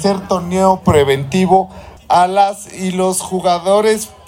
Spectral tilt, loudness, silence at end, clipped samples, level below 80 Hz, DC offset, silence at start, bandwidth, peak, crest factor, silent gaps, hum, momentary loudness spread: -5 dB/octave; -14 LUFS; 0.2 s; under 0.1%; -42 dBFS; under 0.1%; 0 s; 16.5 kHz; 0 dBFS; 14 dB; none; none; 6 LU